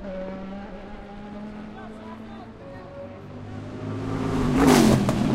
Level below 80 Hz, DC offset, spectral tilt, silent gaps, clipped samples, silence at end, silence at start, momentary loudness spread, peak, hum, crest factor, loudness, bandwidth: -40 dBFS; under 0.1%; -6 dB/octave; none; under 0.1%; 0 s; 0 s; 22 LU; -2 dBFS; none; 22 dB; -22 LUFS; 16 kHz